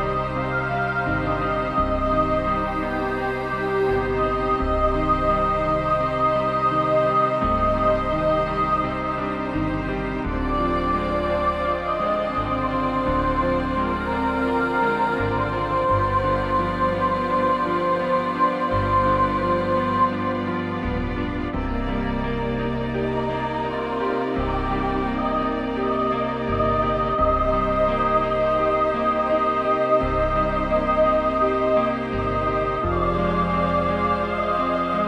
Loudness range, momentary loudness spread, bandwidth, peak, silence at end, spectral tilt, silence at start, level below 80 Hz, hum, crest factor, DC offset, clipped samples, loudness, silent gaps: 4 LU; 5 LU; 10 kHz; -8 dBFS; 0 s; -8 dB/octave; 0 s; -34 dBFS; none; 14 dB; under 0.1%; under 0.1%; -22 LUFS; none